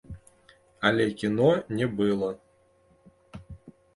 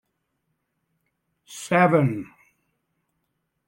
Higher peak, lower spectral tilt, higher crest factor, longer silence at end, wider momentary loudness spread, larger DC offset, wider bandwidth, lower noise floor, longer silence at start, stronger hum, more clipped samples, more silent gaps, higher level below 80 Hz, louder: about the same, -8 dBFS vs -6 dBFS; about the same, -6.5 dB/octave vs -6.5 dB/octave; about the same, 22 dB vs 20 dB; second, 0.25 s vs 1.45 s; first, 24 LU vs 21 LU; neither; second, 11.5 kHz vs 16.5 kHz; second, -63 dBFS vs -76 dBFS; second, 0.1 s vs 1.5 s; neither; neither; neither; first, -56 dBFS vs -70 dBFS; second, -26 LUFS vs -20 LUFS